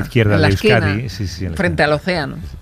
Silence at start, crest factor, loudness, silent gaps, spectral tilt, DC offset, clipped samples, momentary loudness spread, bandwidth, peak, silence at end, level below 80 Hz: 0 s; 14 dB; -16 LUFS; none; -6.5 dB/octave; under 0.1%; under 0.1%; 11 LU; 15 kHz; -2 dBFS; 0 s; -34 dBFS